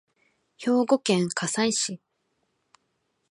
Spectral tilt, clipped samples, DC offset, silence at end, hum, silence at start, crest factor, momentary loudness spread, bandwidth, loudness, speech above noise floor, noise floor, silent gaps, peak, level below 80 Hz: -4 dB/octave; under 0.1%; under 0.1%; 1.35 s; none; 0.6 s; 20 dB; 9 LU; 11.5 kHz; -25 LUFS; 50 dB; -75 dBFS; none; -8 dBFS; -74 dBFS